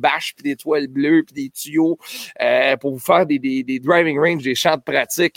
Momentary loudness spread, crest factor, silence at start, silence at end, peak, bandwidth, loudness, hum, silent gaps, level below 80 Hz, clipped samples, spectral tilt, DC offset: 9 LU; 16 dB; 0 s; 0.05 s; -2 dBFS; 17 kHz; -18 LUFS; none; none; -66 dBFS; under 0.1%; -4.5 dB/octave; under 0.1%